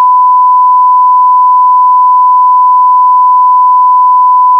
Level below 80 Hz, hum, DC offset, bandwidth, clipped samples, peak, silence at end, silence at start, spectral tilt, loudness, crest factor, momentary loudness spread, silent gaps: under -90 dBFS; none; under 0.1%; 1.1 kHz; under 0.1%; -2 dBFS; 0 s; 0 s; 1.5 dB/octave; -5 LUFS; 4 dB; 0 LU; none